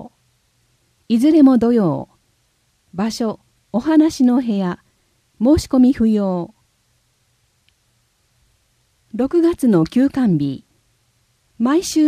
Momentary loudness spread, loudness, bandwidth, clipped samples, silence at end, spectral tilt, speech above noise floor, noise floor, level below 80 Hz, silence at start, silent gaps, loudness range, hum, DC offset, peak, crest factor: 14 LU; -16 LUFS; 14.5 kHz; under 0.1%; 0 s; -6.5 dB/octave; 48 dB; -63 dBFS; -46 dBFS; 0 s; none; 5 LU; none; under 0.1%; -2 dBFS; 16 dB